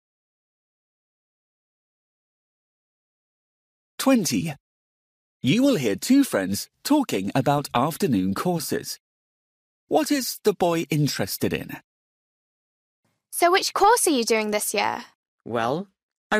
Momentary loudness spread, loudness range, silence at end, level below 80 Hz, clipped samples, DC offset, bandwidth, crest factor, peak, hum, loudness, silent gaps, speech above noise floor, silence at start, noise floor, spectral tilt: 12 LU; 6 LU; 0 s; -62 dBFS; under 0.1%; under 0.1%; 15.5 kHz; 18 dB; -8 dBFS; none; -23 LUFS; 4.60-5.40 s, 9.00-9.87 s, 11.84-13.03 s, 15.15-15.38 s, 16.03-16.09 s, 16.17-16.30 s; over 68 dB; 4 s; under -90 dBFS; -4.5 dB/octave